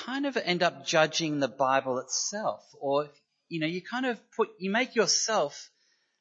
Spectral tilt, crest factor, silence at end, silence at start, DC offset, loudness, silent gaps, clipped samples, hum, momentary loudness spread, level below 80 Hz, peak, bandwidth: -3 dB/octave; 22 dB; 0.55 s; 0 s; under 0.1%; -28 LUFS; none; under 0.1%; none; 9 LU; -84 dBFS; -8 dBFS; 8.2 kHz